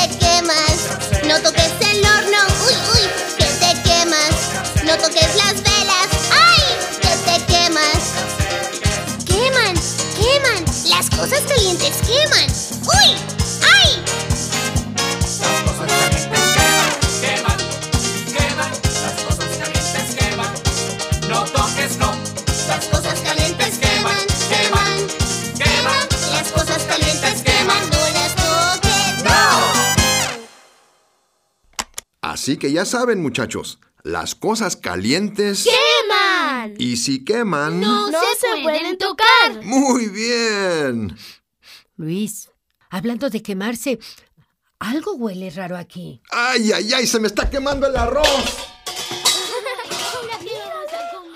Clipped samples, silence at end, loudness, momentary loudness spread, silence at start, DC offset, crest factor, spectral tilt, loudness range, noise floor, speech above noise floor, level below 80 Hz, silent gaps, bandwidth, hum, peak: under 0.1%; 0 s; -16 LUFS; 12 LU; 0 s; under 0.1%; 18 dB; -2.5 dB/octave; 9 LU; -64 dBFS; 45 dB; -32 dBFS; none; 16 kHz; none; 0 dBFS